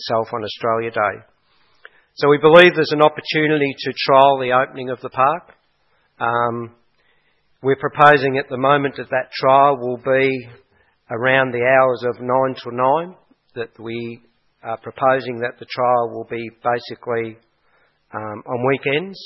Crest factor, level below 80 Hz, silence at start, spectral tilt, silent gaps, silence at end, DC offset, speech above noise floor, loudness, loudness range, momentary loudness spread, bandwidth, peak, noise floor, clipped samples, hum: 18 dB; -62 dBFS; 0 s; -7 dB/octave; none; 0 s; under 0.1%; 45 dB; -17 LUFS; 8 LU; 17 LU; 7.6 kHz; 0 dBFS; -62 dBFS; under 0.1%; none